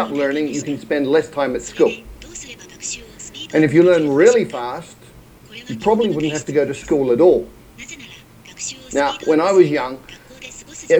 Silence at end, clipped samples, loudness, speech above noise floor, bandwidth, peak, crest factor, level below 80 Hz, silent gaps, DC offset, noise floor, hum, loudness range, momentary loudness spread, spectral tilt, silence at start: 0 s; under 0.1%; -17 LUFS; 27 dB; 16.5 kHz; 0 dBFS; 18 dB; -48 dBFS; none; under 0.1%; -43 dBFS; none; 3 LU; 22 LU; -5 dB/octave; 0 s